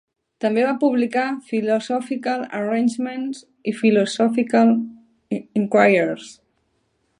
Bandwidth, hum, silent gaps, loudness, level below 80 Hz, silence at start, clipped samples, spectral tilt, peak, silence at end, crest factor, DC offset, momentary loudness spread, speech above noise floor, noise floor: 11 kHz; none; none; -20 LUFS; -72 dBFS; 0.4 s; under 0.1%; -6 dB/octave; 0 dBFS; 0.85 s; 20 dB; under 0.1%; 13 LU; 48 dB; -68 dBFS